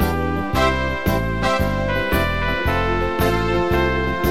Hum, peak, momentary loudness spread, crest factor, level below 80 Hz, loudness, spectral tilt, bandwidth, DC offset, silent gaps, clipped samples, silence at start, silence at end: none; -4 dBFS; 2 LU; 16 dB; -28 dBFS; -20 LUFS; -6 dB/octave; 16 kHz; 2%; none; under 0.1%; 0 s; 0 s